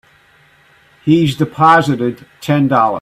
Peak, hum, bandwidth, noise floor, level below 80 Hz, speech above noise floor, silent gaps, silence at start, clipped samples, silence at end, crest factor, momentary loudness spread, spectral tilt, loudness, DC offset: 0 dBFS; none; 14.5 kHz; -50 dBFS; -52 dBFS; 37 dB; none; 1.05 s; under 0.1%; 0 s; 14 dB; 12 LU; -7 dB/octave; -13 LUFS; under 0.1%